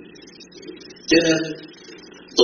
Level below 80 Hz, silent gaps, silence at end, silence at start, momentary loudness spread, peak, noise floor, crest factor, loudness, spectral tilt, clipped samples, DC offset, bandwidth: -56 dBFS; none; 0 s; 0.4 s; 25 LU; -2 dBFS; -44 dBFS; 22 dB; -19 LUFS; -2.5 dB/octave; under 0.1%; under 0.1%; 7 kHz